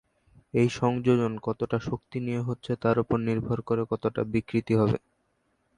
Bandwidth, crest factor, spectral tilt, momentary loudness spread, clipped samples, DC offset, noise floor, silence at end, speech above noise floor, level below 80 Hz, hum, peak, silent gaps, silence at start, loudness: 10.5 kHz; 18 dB; -8 dB/octave; 7 LU; under 0.1%; under 0.1%; -72 dBFS; 0.8 s; 46 dB; -54 dBFS; none; -10 dBFS; none; 0.55 s; -28 LUFS